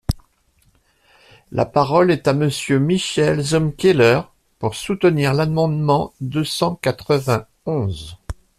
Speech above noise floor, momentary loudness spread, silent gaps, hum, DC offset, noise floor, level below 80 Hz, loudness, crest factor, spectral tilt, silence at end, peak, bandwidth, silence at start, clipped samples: 42 dB; 12 LU; none; none; under 0.1%; -60 dBFS; -42 dBFS; -18 LUFS; 18 dB; -6 dB/octave; 0.25 s; -2 dBFS; 14 kHz; 0.1 s; under 0.1%